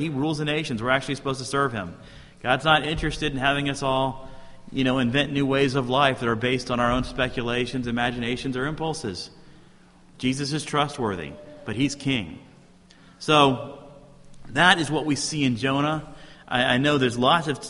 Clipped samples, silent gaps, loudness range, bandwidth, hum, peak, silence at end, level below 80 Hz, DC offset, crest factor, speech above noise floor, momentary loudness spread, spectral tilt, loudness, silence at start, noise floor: under 0.1%; none; 6 LU; 11.5 kHz; none; 0 dBFS; 0 s; -46 dBFS; under 0.1%; 24 dB; 28 dB; 13 LU; -4.5 dB/octave; -24 LUFS; 0 s; -52 dBFS